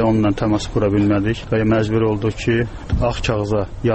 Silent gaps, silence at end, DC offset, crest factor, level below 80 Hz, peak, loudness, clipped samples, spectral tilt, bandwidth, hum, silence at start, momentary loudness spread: none; 0 s; under 0.1%; 12 dB; -32 dBFS; -6 dBFS; -19 LUFS; under 0.1%; -7 dB/octave; 8.6 kHz; none; 0 s; 4 LU